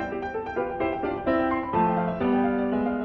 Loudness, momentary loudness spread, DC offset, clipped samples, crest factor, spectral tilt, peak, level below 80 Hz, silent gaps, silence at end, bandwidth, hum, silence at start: -26 LUFS; 6 LU; under 0.1%; under 0.1%; 14 dB; -9 dB/octave; -12 dBFS; -48 dBFS; none; 0 s; 5.8 kHz; none; 0 s